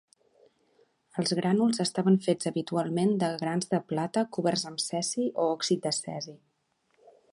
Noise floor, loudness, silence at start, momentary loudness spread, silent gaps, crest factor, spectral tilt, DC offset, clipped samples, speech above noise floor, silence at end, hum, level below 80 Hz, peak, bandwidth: -73 dBFS; -28 LUFS; 1.15 s; 6 LU; none; 18 dB; -5 dB/octave; under 0.1%; under 0.1%; 45 dB; 0.95 s; none; -74 dBFS; -12 dBFS; 11.5 kHz